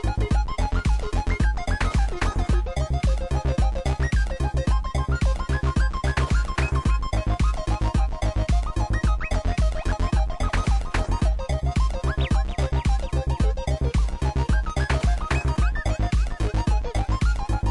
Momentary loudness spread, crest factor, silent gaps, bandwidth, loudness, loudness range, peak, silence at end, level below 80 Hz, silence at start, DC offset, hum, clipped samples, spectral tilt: 2 LU; 12 dB; none; 11 kHz; -25 LUFS; 1 LU; -10 dBFS; 0 s; -24 dBFS; 0 s; under 0.1%; none; under 0.1%; -6 dB/octave